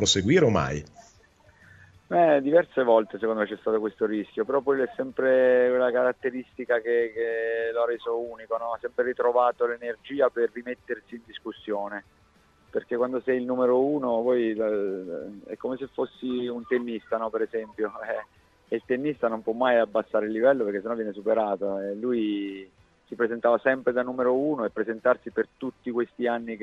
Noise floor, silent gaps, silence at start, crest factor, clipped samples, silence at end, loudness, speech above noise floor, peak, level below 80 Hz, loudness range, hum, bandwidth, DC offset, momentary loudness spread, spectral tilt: -60 dBFS; none; 0 s; 20 dB; under 0.1%; 0 s; -26 LUFS; 35 dB; -6 dBFS; -60 dBFS; 6 LU; none; 8 kHz; under 0.1%; 12 LU; -5 dB/octave